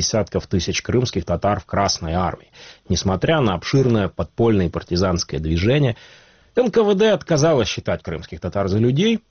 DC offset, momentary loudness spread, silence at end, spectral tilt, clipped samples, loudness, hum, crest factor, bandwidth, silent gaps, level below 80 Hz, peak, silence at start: 0.2%; 8 LU; 0.1 s; -5.5 dB/octave; under 0.1%; -20 LUFS; none; 16 dB; 6.8 kHz; none; -38 dBFS; -4 dBFS; 0 s